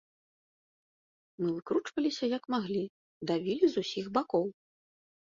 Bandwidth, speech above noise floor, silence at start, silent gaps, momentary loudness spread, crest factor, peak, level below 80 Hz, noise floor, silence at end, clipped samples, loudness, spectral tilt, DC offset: 7.6 kHz; over 59 dB; 1.4 s; 2.89-3.21 s; 7 LU; 20 dB; -14 dBFS; -74 dBFS; under -90 dBFS; 0.8 s; under 0.1%; -32 LUFS; -6 dB/octave; under 0.1%